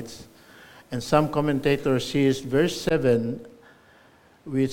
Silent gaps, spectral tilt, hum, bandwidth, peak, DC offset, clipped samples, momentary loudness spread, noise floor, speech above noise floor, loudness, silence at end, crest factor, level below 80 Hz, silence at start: none; -6 dB/octave; none; 17 kHz; -4 dBFS; under 0.1%; under 0.1%; 13 LU; -56 dBFS; 32 dB; -24 LUFS; 0 s; 20 dB; -52 dBFS; 0 s